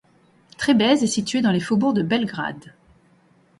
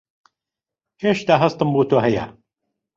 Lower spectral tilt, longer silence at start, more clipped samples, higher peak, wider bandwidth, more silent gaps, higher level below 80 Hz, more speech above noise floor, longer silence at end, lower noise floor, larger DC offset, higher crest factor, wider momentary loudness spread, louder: second, -5 dB/octave vs -7 dB/octave; second, 0.6 s vs 1 s; neither; second, -6 dBFS vs -2 dBFS; first, 11.5 kHz vs 7.6 kHz; neither; about the same, -58 dBFS vs -54 dBFS; second, 37 dB vs 70 dB; first, 0.9 s vs 0.65 s; second, -57 dBFS vs -88 dBFS; neither; about the same, 16 dB vs 18 dB; first, 12 LU vs 8 LU; about the same, -21 LUFS vs -19 LUFS